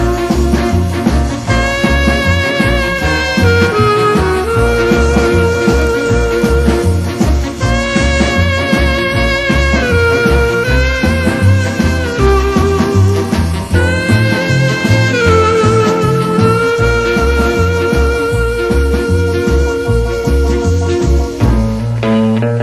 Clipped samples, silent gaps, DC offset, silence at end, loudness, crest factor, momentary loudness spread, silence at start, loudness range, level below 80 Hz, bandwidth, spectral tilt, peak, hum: under 0.1%; none; under 0.1%; 0 s; -12 LUFS; 12 dB; 4 LU; 0 s; 2 LU; -18 dBFS; 13 kHz; -6 dB/octave; 0 dBFS; none